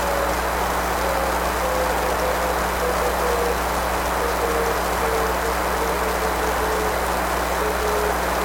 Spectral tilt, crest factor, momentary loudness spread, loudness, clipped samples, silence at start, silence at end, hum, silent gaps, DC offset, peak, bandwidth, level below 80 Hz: -3.5 dB/octave; 14 dB; 1 LU; -22 LUFS; under 0.1%; 0 s; 0 s; none; none; under 0.1%; -8 dBFS; 17.5 kHz; -32 dBFS